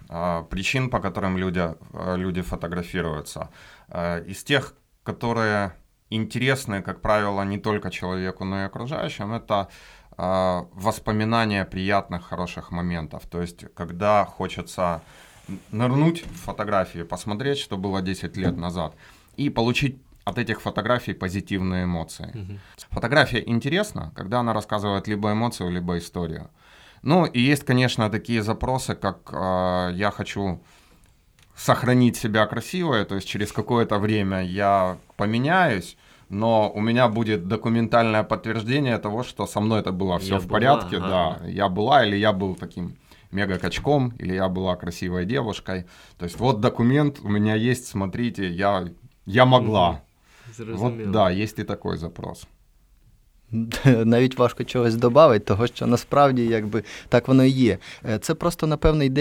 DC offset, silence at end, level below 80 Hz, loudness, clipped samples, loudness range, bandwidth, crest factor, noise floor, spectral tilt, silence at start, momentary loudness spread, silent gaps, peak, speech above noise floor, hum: under 0.1%; 0 s; -46 dBFS; -23 LUFS; under 0.1%; 7 LU; 17 kHz; 22 dB; -57 dBFS; -6 dB/octave; 0.1 s; 14 LU; none; -2 dBFS; 34 dB; none